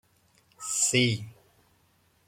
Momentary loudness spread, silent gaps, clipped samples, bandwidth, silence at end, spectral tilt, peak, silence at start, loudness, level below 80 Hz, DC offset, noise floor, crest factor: 18 LU; none; under 0.1%; 16.5 kHz; 0.95 s; -3 dB/octave; -10 dBFS; 0.6 s; -25 LUFS; -68 dBFS; under 0.1%; -66 dBFS; 22 dB